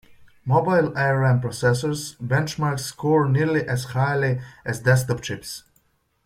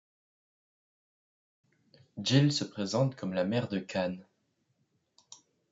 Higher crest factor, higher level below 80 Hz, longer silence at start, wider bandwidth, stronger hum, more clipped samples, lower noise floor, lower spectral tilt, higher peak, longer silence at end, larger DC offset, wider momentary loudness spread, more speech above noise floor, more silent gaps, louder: second, 18 dB vs 24 dB; first, -54 dBFS vs -76 dBFS; second, 0.45 s vs 2.15 s; first, 15.5 kHz vs 7.8 kHz; neither; neither; second, -65 dBFS vs -76 dBFS; about the same, -6 dB/octave vs -5.5 dB/octave; first, -4 dBFS vs -12 dBFS; first, 0.65 s vs 0.35 s; neither; about the same, 11 LU vs 10 LU; second, 43 dB vs 47 dB; neither; first, -22 LUFS vs -31 LUFS